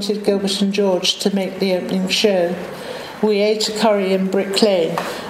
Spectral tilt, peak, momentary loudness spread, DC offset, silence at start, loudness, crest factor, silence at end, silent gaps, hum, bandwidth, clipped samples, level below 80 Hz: -4.5 dB/octave; 0 dBFS; 6 LU; under 0.1%; 0 s; -18 LUFS; 18 dB; 0 s; none; none; 16 kHz; under 0.1%; -60 dBFS